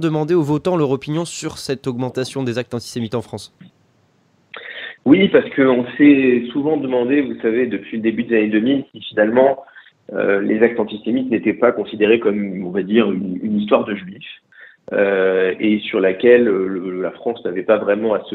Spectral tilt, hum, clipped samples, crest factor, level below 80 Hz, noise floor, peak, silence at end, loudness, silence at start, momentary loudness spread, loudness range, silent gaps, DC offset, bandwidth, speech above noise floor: -6.5 dB/octave; none; under 0.1%; 18 dB; -58 dBFS; -58 dBFS; 0 dBFS; 0 s; -17 LUFS; 0 s; 12 LU; 7 LU; none; under 0.1%; 11.5 kHz; 41 dB